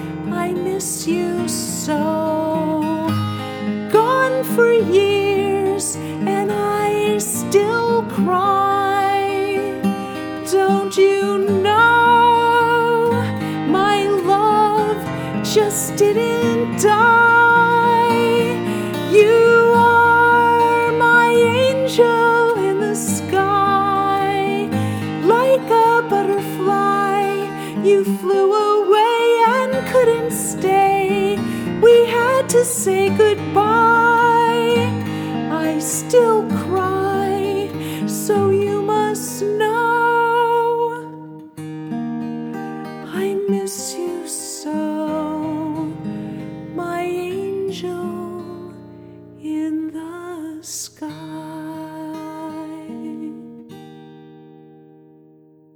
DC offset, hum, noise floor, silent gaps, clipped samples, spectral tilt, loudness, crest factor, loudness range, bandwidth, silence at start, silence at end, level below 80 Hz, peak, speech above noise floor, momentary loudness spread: under 0.1%; none; -49 dBFS; none; under 0.1%; -4.5 dB/octave; -16 LUFS; 16 dB; 14 LU; 19.5 kHz; 0 s; 1.4 s; -60 dBFS; -2 dBFS; 33 dB; 16 LU